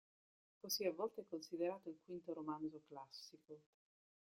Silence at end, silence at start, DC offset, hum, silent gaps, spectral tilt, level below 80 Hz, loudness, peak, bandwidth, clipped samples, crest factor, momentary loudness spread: 0.75 s; 0.65 s; under 0.1%; none; none; -3.5 dB/octave; under -90 dBFS; -47 LUFS; -28 dBFS; 16 kHz; under 0.1%; 20 dB; 17 LU